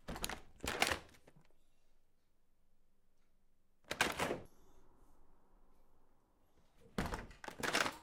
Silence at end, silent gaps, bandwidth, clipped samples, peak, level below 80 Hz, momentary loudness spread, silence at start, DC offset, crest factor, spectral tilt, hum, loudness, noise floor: 0 s; none; 17 kHz; under 0.1%; -12 dBFS; -60 dBFS; 12 LU; 0.05 s; under 0.1%; 32 dB; -2.5 dB/octave; none; -40 LUFS; -69 dBFS